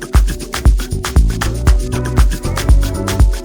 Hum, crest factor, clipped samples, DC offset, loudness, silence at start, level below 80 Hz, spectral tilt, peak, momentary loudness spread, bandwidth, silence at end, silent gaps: none; 12 dB; under 0.1%; under 0.1%; -16 LUFS; 0 s; -14 dBFS; -5.5 dB/octave; 0 dBFS; 4 LU; 19.5 kHz; 0 s; none